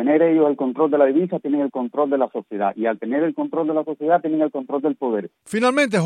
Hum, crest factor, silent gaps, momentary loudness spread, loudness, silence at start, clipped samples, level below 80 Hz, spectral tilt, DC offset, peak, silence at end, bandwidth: none; 16 dB; none; 7 LU; -21 LUFS; 0 s; under 0.1%; -76 dBFS; -6.5 dB/octave; under 0.1%; -4 dBFS; 0 s; 11 kHz